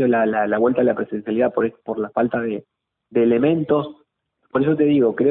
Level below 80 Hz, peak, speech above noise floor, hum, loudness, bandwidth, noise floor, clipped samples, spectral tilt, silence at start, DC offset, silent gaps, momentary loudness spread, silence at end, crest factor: -60 dBFS; -6 dBFS; 50 dB; none; -20 LUFS; 4 kHz; -68 dBFS; under 0.1%; -12 dB/octave; 0 s; under 0.1%; none; 9 LU; 0 s; 14 dB